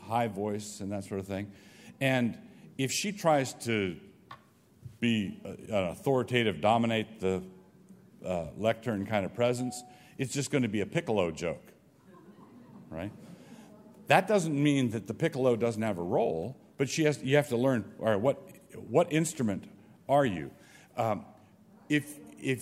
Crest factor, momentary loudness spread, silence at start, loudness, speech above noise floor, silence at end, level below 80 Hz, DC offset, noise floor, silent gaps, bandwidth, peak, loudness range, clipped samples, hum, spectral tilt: 24 dB; 17 LU; 0 s; -30 LUFS; 30 dB; 0 s; -66 dBFS; under 0.1%; -60 dBFS; none; 16 kHz; -6 dBFS; 5 LU; under 0.1%; none; -5.5 dB/octave